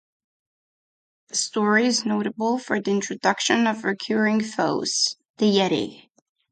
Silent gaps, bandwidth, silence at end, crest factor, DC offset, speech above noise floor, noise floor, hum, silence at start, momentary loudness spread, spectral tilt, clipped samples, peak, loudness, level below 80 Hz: 5.30-5.34 s; 9.4 kHz; 0.55 s; 20 dB; under 0.1%; over 68 dB; under -90 dBFS; none; 1.35 s; 6 LU; -3.5 dB/octave; under 0.1%; -4 dBFS; -22 LUFS; -68 dBFS